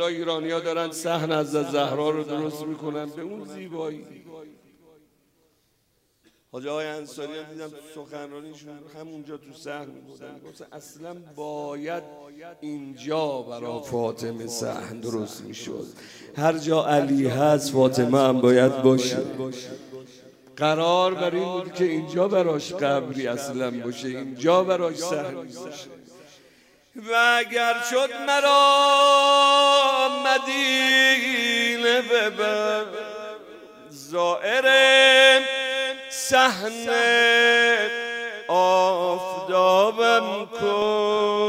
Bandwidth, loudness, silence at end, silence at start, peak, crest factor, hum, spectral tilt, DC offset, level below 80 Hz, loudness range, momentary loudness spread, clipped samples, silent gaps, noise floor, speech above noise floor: 16 kHz; -21 LUFS; 0 s; 0 s; -4 dBFS; 20 dB; none; -3.5 dB/octave; under 0.1%; -72 dBFS; 20 LU; 22 LU; under 0.1%; none; -68 dBFS; 46 dB